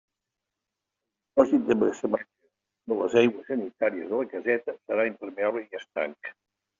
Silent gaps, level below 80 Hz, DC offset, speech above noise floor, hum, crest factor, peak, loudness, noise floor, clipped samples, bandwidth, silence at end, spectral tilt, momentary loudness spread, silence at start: none; -70 dBFS; under 0.1%; 60 dB; none; 22 dB; -6 dBFS; -27 LUFS; -86 dBFS; under 0.1%; 7.4 kHz; 0.5 s; -4.5 dB/octave; 12 LU; 1.35 s